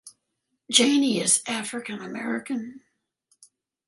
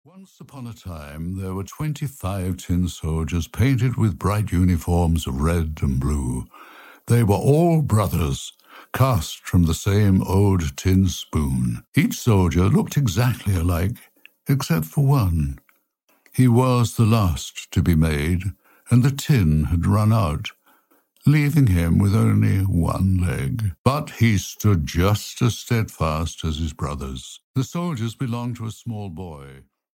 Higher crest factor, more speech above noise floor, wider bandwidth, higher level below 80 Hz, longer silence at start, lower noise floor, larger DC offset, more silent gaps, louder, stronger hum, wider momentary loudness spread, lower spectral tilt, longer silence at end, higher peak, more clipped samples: first, 24 dB vs 16 dB; first, 54 dB vs 45 dB; second, 11.5 kHz vs 17 kHz; second, -76 dBFS vs -34 dBFS; about the same, 0.05 s vs 0.15 s; first, -78 dBFS vs -65 dBFS; neither; second, none vs 11.88-11.92 s, 16.04-16.08 s, 23.78-23.84 s, 27.43-27.54 s; about the same, -23 LUFS vs -21 LUFS; neither; about the same, 14 LU vs 13 LU; second, -2 dB/octave vs -6.5 dB/octave; first, 1.1 s vs 0.4 s; about the same, -2 dBFS vs -4 dBFS; neither